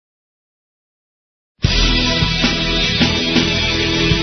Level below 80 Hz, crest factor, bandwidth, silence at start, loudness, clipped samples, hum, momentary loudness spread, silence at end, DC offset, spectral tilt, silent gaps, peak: -26 dBFS; 18 dB; 6.4 kHz; 1.6 s; -15 LUFS; under 0.1%; none; 2 LU; 0 s; under 0.1%; -4 dB/octave; none; 0 dBFS